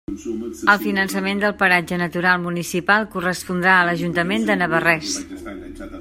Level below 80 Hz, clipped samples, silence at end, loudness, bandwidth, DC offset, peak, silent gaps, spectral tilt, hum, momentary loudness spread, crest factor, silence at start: -50 dBFS; under 0.1%; 0 s; -19 LUFS; 16.5 kHz; under 0.1%; 0 dBFS; none; -4.5 dB/octave; none; 13 LU; 20 dB; 0.1 s